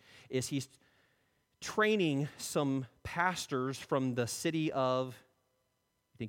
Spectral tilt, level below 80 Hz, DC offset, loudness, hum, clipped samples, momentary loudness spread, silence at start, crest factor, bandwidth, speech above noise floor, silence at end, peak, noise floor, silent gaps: -5 dB/octave; -68 dBFS; under 0.1%; -34 LUFS; none; under 0.1%; 9 LU; 0.15 s; 20 dB; 16.5 kHz; 46 dB; 0 s; -16 dBFS; -80 dBFS; none